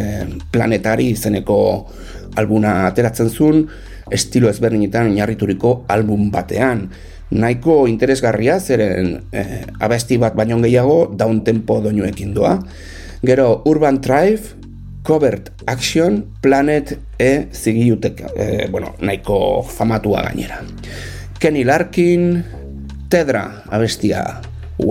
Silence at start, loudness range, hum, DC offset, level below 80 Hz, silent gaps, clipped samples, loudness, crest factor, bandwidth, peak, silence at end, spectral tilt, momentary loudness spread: 0 s; 2 LU; none; under 0.1%; -36 dBFS; none; under 0.1%; -16 LUFS; 14 dB; 16.5 kHz; -2 dBFS; 0 s; -6.5 dB/octave; 13 LU